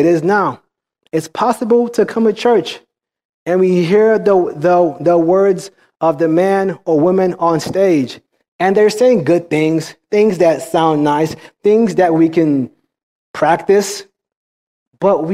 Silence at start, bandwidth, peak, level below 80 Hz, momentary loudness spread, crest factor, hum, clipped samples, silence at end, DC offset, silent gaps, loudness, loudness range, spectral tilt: 0 s; 15 kHz; 0 dBFS; -58 dBFS; 9 LU; 12 dB; none; under 0.1%; 0 s; under 0.1%; 3.25-3.46 s, 8.48-8.59 s, 13.03-13.34 s, 14.36-14.91 s; -14 LUFS; 2 LU; -6 dB/octave